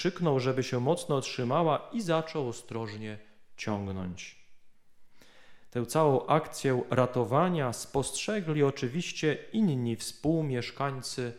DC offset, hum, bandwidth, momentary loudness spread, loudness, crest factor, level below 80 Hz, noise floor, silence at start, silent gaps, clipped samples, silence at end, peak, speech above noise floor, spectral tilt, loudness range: under 0.1%; none; 15.5 kHz; 11 LU; -30 LUFS; 20 dB; -62 dBFS; -51 dBFS; 0 s; none; under 0.1%; 0 s; -10 dBFS; 21 dB; -5.5 dB/octave; 8 LU